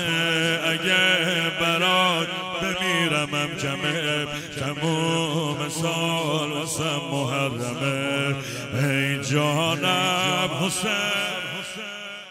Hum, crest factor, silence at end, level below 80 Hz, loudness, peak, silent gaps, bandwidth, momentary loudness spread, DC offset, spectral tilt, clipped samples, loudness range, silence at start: none; 16 dB; 0 s; -60 dBFS; -23 LUFS; -8 dBFS; none; 16 kHz; 8 LU; under 0.1%; -3.5 dB/octave; under 0.1%; 4 LU; 0 s